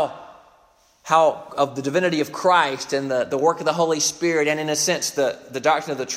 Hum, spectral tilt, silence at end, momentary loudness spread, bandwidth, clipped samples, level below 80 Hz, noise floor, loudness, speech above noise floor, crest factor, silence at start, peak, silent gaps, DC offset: none; -3 dB/octave; 0 s; 6 LU; 16 kHz; under 0.1%; -68 dBFS; -57 dBFS; -21 LUFS; 36 dB; 20 dB; 0 s; -2 dBFS; none; under 0.1%